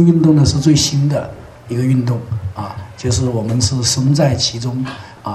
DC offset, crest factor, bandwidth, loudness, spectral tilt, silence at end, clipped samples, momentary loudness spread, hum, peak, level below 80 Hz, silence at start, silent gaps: under 0.1%; 14 dB; 13.5 kHz; -15 LUFS; -5.5 dB/octave; 0 s; under 0.1%; 15 LU; none; 0 dBFS; -38 dBFS; 0 s; none